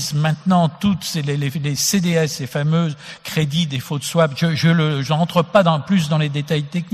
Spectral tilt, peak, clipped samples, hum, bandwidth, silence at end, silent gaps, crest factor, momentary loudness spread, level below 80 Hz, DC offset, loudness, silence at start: -5.5 dB/octave; -2 dBFS; under 0.1%; none; 14 kHz; 0.05 s; none; 16 dB; 6 LU; -54 dBFS; under 0.1%; -18 LUFS; 0 s